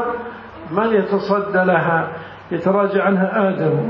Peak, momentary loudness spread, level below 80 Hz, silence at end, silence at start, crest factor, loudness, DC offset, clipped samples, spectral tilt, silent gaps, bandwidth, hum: -4 dBFS; 12 LU; -54 dBFS; 0 s; 0 s; 14 dB; -18 LUFS; under 0.1%; under 0.1%; -9.5 dB/octave; none; 5.8 kHz; none